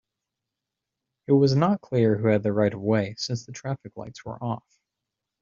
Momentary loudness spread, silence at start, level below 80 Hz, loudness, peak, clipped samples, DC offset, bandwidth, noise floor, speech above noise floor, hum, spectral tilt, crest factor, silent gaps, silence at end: 16 LU; 1.3 s; -62 dBFS; -24 LUFS; -6 dBFS; under 0.1%; under 0.1%; 7.6 kHz; -85 dBFS; 62 dB; none; -6.5 dB/octave; 20 dB; none; 0.8 s